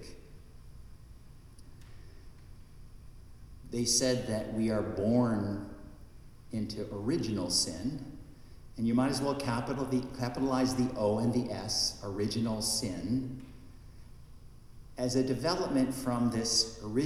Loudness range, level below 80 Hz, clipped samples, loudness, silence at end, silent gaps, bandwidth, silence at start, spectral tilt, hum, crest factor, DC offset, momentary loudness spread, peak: 4 LU; -52 dBFS; under 0.1%; -31 LUFS; 0 s; none; 15 kHz; 0 s; -4.5 dB/octave; none; 18 dB; under 0.1%; 14 LU; -14 dBFS